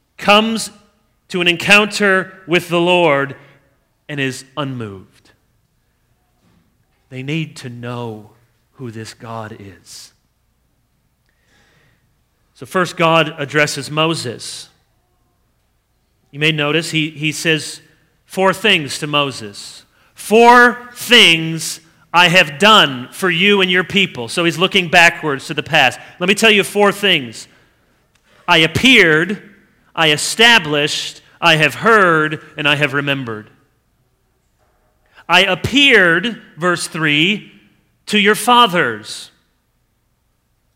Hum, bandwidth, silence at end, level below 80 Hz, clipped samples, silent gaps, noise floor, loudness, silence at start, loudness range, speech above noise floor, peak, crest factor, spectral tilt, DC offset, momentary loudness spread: none; 16.5 kHz; 1.5 s; -54 dBFS; 0.2%; none; -63 dBFS; -13 LUFS; 0.2 s; 17 LU; 49 dB; 0 dBFS; 16 dB; -3.5 dB/octave; under 0.1%; 20 LU